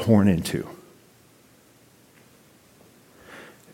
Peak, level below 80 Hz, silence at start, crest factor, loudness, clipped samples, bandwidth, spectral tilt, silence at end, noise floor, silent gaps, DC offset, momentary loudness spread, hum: -4 dBFS; -54 dBFS; 0 s; 22 dB; -22 LUFS; under 0.1%; 17 kHz; -7 dB/octave; 0.3 s; -56 dBFS; none; under 0.1%; 27 LU; none